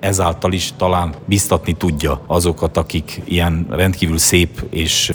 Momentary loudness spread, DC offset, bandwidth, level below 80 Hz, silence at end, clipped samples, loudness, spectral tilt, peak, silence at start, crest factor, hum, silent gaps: 7 LU; under 0.1%; over 20 kHz; -32 dBFS; 0 s; under 0.1%; -16 LUFS; -4 dB/octave; 0 dBFS; 0 s; 16 dB; none; none